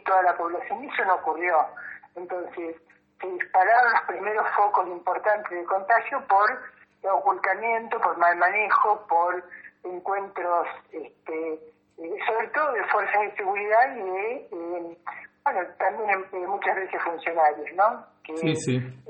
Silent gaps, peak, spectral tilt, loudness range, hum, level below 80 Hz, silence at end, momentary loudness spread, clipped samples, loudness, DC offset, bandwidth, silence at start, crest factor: none; -8 dBFS; -5.5 dB/octave; 5 LU; none; -76 dBFS; 0 s; 16 LU; under 0.1%; -25 LUFS; under 0.1%; 8.8 kHz; 0.05 s; 18 dB